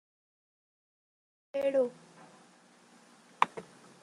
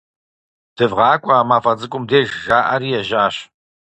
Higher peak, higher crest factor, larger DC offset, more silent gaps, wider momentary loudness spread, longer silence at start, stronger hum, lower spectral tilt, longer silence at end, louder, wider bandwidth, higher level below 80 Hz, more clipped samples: second, -6 dBFS vs 0 dBFS; first, 32 dB vs 18 dB; neither; neither; first, 23 LU vs 6 LU; first, 1.55 s vs 0.8 s; first, 60 Hz at -65 dBFS vs none; about the same, -4.5 dB/octave vs -5.5 dB/octave; about the same, 0.4 s vs 0.5 s; second, -32 LUFS vs -16 LUFS; first, 11.5 kHz vs 8.8 kHz; second, -86 dBFS vs -54 dBFS; neither